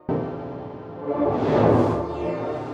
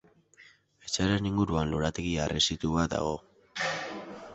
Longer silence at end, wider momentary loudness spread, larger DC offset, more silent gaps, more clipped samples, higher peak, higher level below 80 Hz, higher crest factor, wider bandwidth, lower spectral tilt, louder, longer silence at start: about the same, 0 s vs 0 s; first, 16 LU vs 13 LU; neither; neither; neither; first, -6 dBFS vs -12 dBFS; about the same, -46 dBFS vs -46 dBFS; about the same, 18 dB vs 20 dB; about the same, 8.6 kHz vs 8.2 kHz; first, -9 dB/octave vs -4.5 dB/octave; first, -23 LUFS vs -30 LUFS; second, 0.1 s vs 0.4 s